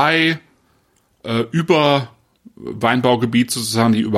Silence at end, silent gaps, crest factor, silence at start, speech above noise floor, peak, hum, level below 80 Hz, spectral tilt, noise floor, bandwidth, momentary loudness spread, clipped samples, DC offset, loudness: 0 s; none; 16 dB; 0 s; 44 dB; -2 dBFS; none; -58 dBFS; -5 dB/octave; -60 dBFS; 15 kHz; 18 LU; under 0.1%; under 0.1%; -17 LUFS